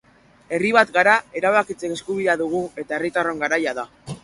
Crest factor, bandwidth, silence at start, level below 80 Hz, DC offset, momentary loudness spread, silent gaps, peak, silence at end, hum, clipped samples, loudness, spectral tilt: 20 dB; 11.5 kHz; 0.5 s; -60 dBFS; under 0.1%; 12 LU; none; -2 dBFS; 0.05 s; none; under 0.1%; -20 LUFS; -4.5 dB/octave